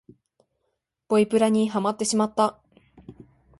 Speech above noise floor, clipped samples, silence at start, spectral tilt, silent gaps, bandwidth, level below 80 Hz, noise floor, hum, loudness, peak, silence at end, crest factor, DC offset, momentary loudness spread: 56 dB; under 0.1%; 1.1 s; -5 dB/octave; none; 11.5 kHz; -64 dBFS; -78 dBFS; none; -23 LUFS; -8 dBFS; 0.5 s; 18 dB; under 0.1%; 4 LU